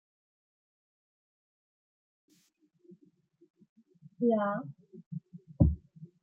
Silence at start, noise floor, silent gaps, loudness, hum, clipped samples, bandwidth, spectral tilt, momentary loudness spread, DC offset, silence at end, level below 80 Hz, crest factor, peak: 4.2 s; -71 dBFS; 5.06-5.11 s; -31 LUFS; none; under 0.1%; 3.4 kHz; -11 dB/octave; 25 LU; under 0.1%; 0.2 s; -46 dBFS; 26 dB; -10 dBFS